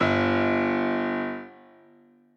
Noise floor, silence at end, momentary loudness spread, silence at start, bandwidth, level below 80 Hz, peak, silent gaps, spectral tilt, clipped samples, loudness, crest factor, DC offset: -57 dBFS; 0.85 s; 14 LU; 0 s; 7 kHz; -68 dBFS; -10 dBFS; none; -7 dB/octave; under 0.1%; -25 LUFS; 16 dB; under 0.1%